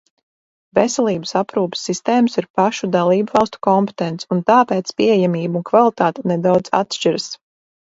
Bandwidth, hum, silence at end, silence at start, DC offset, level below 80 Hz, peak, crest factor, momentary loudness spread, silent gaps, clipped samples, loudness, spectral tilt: 8 kHz; none; 0.55 s; 0.75 s; under 0.1%; -60 dBFS; 0 dBFS; 18 dB; 7 LU; 2.50-2.54 s; under 0.1%; -17 LUFS; -5.5 dB/octave